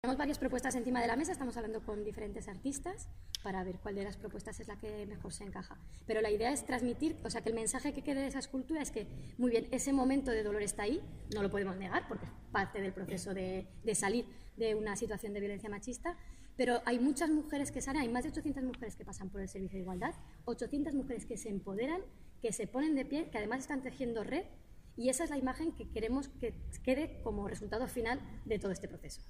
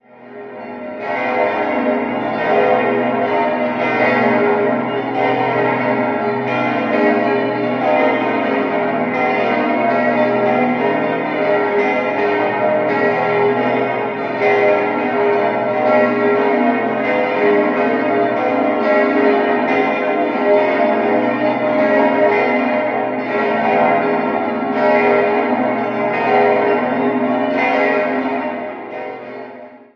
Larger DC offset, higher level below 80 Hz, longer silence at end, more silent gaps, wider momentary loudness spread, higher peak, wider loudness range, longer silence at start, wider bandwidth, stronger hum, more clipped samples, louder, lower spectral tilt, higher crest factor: neither; first, -52 dBFS vs -62 dBFS; second, 0 s vs 0.2 s; neither; first, 11 LU vs 5 LU; second, -18 dBFS vs -2 dBFS; first, 5 LU vs 1 LU; second, 0.05 s vs 0.2 s; first, 15.5 kHz vs 6.4 kHz; neither; neither; second, -38 LUFS vs -16 LUFS; second, -4.5 dB/octave vs -7.5 dB/octave; about the same, 18 dB vs 14 dB